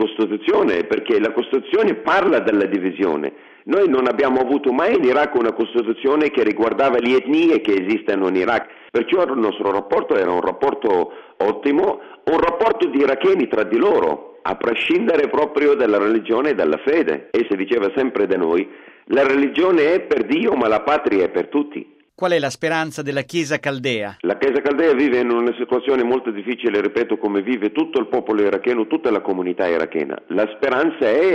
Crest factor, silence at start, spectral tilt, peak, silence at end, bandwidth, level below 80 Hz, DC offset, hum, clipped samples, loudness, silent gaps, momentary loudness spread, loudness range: 12 dB; 0 s; -5.5 dB/octave; -6 dBFS; 0 s; 10 kHz; -56 dBFS; under 0.1%; none; under 0.1%; -18 LUFS; none; 6 LU; 2 LU